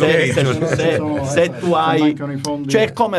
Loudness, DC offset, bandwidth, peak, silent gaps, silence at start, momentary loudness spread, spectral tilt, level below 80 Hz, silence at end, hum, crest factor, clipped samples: -17 LUFS; under 0.1%; 12 kHz; -2 dBFS; none; 0 s; 6 LU; -5.5 dB/octave; -50 dBFS; 0 s; none; 16 dB; under 0.1%